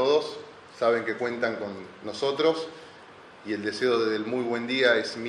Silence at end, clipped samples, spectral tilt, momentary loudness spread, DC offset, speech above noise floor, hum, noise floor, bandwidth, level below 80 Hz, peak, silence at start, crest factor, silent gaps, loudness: 0 s; under 0.1%; -4.5 dB/octave; 17 LU; under 0.1%; 22 dB; none; -48 dBFS; 11 kHz; -72 dBFS; -8 dBFS; 0 s; 20 dB; none; -27 LUFS